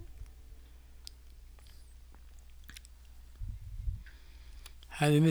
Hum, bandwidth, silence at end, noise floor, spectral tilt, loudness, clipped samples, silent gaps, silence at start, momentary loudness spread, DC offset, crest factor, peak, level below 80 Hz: none; over 20 kHz; 0 s; -53 dBFS; -6.5 dB/octave; -35 LUFS; under 0.1%; none; 0 s; 20 LU; under 0.1%; 22 dB; -14 dBFS; -48 dBFS